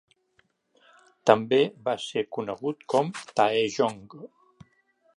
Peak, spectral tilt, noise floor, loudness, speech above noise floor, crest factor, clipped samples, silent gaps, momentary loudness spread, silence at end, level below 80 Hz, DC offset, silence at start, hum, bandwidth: -2 dBFS; -5 dB/octave; -69 dBFS; -26 LUFS; 43 dB; 26 dB; under 0.1%; none; 11 LU; 0.9 s; -72 dBFS; under 0.1%; 1.25 s; none; 11 kHz